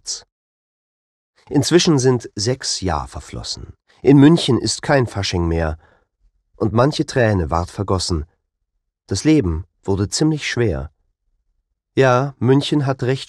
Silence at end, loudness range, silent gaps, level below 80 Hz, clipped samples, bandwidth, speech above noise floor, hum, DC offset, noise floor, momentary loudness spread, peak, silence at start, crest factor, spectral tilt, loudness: 0.05 s; 4 LU; 0.32-1.34 s; -38 dBFS; under 0.1%; 12.5 kHz; 57 dB; none; under 0.1%; -74 dBFS; 13 LU; 0 dBFS; 0.05 s; 18 dB; -5.5 dB/octave; -18 LUFS